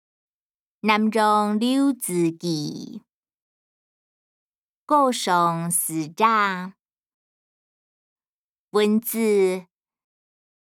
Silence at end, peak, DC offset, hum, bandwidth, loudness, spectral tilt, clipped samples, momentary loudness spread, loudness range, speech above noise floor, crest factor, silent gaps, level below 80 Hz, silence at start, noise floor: 1.05 s; -6 dBFS; under 0.1%; none; 18.5 kHz; -21 LUFS; -4.5 dB/octave; under 0.1%; 11 LU; 4 LU; over 69 dB; 20 dB; 3.14-3.23 s, 3.35-4.86 s, 6.79-6.86 s, 6.92-6.96 s, 7.06-8.16 s, 8.29-8.68 s; -78 dBFS; 0.85 s; under -90 dBFS